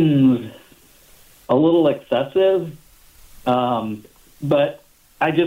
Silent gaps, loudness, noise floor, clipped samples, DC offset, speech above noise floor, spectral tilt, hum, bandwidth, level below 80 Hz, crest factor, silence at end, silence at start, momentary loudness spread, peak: none; -19 LUFS; -50 dBFS; under 0.1%; under 0.1%; 33 dB; -8 dB/octave; none; 16 kHz; -54 dBFS; 14 dB; 0 s; 0 s; 15 LU; -6 dBFS